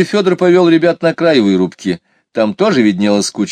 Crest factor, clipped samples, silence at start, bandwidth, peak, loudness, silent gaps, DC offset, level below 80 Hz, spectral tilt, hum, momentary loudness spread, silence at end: 12 dB; under 0.1%; 0 s; 10.5 kHz; 0 dBFS; -12 LUFS; none; under 0.1%; -58 dBFS; -5.5 dB/octave; none; 11 LU; 0 s